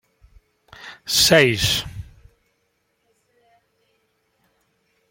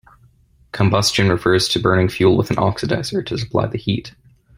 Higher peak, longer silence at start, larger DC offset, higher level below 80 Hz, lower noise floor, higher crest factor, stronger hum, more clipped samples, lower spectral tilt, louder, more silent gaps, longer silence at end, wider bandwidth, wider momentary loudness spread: about the same, -2 dBFS vs -2 dBFS; about the same, 0.8 s vs 0.75 s; neither; about the same, -46 dBFS vs -44 dBFS; first, -70 dBFS vs -53 dBFS; first, 24 dB vs 16 dB; neither; neither; second, -2.5 dB/octave vs -5 dB/octave; about the same, -16 LUFS vs -18 LUFS; neither; first, 3.1 s vs 0.45 s; about the same, 16.5 kHz vs 16 kHz; first, 26 LU vs 8 LU